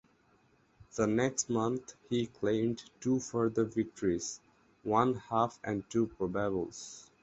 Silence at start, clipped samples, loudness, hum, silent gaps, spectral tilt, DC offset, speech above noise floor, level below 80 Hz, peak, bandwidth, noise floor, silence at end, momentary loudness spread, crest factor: 0.8 s; under 0.1%; -33 LUFS; none; none; -5.5 dB/octave; under 0.1%; 35 dB; -62 dBFS; -12 dBFS; 8.2 kHz; -68 dBFS; 0.2 s; 11 LU; 22 dB